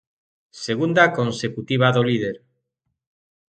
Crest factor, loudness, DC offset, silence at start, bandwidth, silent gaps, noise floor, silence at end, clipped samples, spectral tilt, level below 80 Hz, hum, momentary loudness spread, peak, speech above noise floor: 22 dB; -20 LUFS; under 0.1%; 0.55 s; 9.2 kHz; none; -77 dBFS; 1.2 s; under 0.1%; -6 dB/octave; -60 dBFS; none; 13 LU; 0 dBFS; 57 dB